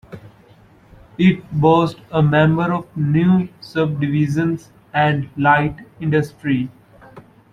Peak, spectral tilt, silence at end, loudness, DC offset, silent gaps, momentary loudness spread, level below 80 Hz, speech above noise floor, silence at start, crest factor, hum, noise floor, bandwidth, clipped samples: -2 dBFS; -8 dB/octave; 0.35 s; -18 LUFS; under 0.1%; none; 10 LU; -48 dBFS; 32 dB; 0.1 s; 16 dB; none; -48 dBFS; 9.4 kHz; under 0.1%